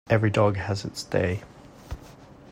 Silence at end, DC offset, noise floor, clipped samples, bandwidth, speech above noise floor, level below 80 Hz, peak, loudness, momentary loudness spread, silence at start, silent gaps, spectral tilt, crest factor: 0 s; under 0.1%; -48 dBFS; under 0.1%; 15 kHz; 23 dB; -50 dBFS; -8 dBFS; -26 LUFS; 20 LU; 0.1 s; none; -6.5 dB/octave; 20 dB